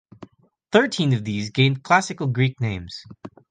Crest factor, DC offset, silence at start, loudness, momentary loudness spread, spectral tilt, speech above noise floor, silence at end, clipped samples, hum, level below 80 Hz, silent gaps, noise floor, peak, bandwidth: 20 dB; under 0.1%; 0.2 s; -21 LUFS; 16 LU; -5.5 dB/octave; 27 dB; 0.2 s; under 0.1%; none; -52 dBFS; none; -48 dBFS; -4 dBFS; 9.4 kHz